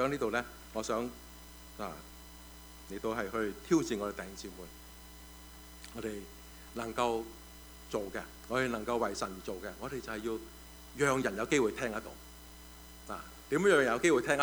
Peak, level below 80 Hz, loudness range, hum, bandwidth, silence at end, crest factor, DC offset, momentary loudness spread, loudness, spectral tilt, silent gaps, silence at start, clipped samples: -12 dBFS; -56 dBFS; 8 LU; none; over 20 kHz; 0 s; 22 dB; under 0.1%; 21 LU; -34 LUFS; -4.5 dB/octave; none; 0 s; under 0.1%